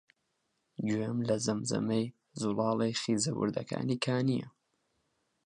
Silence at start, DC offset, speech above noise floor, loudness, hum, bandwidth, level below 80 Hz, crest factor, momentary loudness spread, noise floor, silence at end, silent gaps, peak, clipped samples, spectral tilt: 0.8 s; under 0.1%; 48 dB; -32 LUFS; none; 11 kHz; -70 dBFS; 16 dB; 7 LU; -80 dBFS; 0.95 s; none; -16 dBFS; under 0.1%; -5 dB/octave